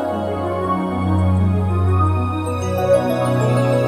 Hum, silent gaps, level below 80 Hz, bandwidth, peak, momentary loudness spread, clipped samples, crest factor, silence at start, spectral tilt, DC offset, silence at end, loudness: none; none; -40 dBFS; 13.5 kHz; -4 dBFS; 5 LU; under 0.1%; 12 dB; 0 s; -8 dB/octave; under 0.1%; 0 s; -18 LUFS